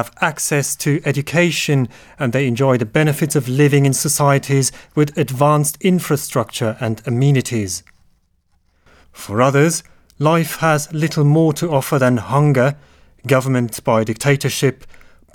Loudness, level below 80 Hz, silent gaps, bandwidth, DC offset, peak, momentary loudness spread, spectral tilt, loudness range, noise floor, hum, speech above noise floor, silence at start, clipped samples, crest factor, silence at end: -17 LUFS; -52 dBFS; none; 18.5 kHz; under 0.1%; 0 dBFS; 7 LU; -5.5 dB/octave; 4 LU; -60 dBFS; none; 44 dB; 0 s; under 0.1%; 16 dB; 0.35 s